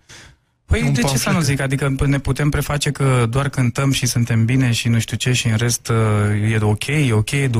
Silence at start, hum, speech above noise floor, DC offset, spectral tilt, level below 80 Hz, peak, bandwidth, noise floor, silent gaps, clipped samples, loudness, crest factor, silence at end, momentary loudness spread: 0.1 s; none; 31 dB; under 0.1%; -5 dB/octave; -34 dBFS; -6 dBFS; 16 kHz; -48 dBFS; none; under 0.1%; -18 LUFS; 12 dB; 0 s; 2 LU